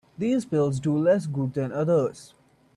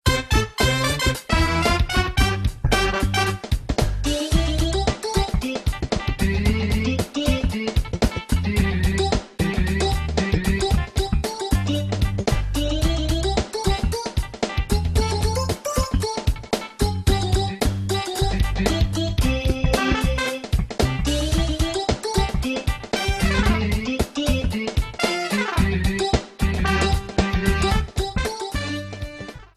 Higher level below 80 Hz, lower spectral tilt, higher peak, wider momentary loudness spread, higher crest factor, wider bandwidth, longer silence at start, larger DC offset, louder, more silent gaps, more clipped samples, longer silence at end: second, -62 dBFS vs -26 dBFS; first, -8 dB/octave vs -5 dB/octave; second, -12 dBFS vs -2 dBFS; about the same, 6 LU vs 5 LU; about the same, 14 dB vs 18 dB; second, 12 kHz vs 14.5 kHz; first, 0.2 s vs 0.05 s; neither; second, -25 LUFS vs -22 LUFS; neither; neither; first, 0.5 s vs 0.15 s